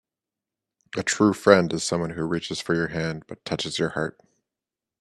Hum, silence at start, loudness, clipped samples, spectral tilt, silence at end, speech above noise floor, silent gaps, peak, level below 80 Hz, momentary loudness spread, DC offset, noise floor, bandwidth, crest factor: none; 0.95 s; -24 LUFS; under 0.1%; -4.5 dB/octave; 0.9 s; 65 dB; none; 0 dBFS; -60 dBFS; 13 LU; under 0.1%; -89 dBFS; 13 kHz; 24 dB